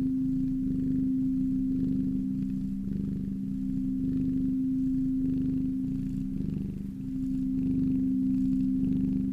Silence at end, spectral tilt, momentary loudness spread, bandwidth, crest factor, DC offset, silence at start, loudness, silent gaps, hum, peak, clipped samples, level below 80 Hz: 0 s; -10.5 dB/octave; 5 LU; 3 kHz; 12 dB; under 0.1%; 0 s; -30 LUFS; none; none; -16 dBFS; under 0.1%; -42 dBFS